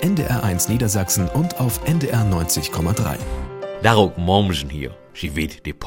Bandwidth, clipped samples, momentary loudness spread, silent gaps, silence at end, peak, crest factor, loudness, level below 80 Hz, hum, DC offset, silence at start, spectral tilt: 17 kHz; under 0.1%; 12 LU; none; 0 s; 0 dBFS; 20 dB; -20 LUFS; -36 dBFS; none; under 0.1%; 0 s; -5 dB/octave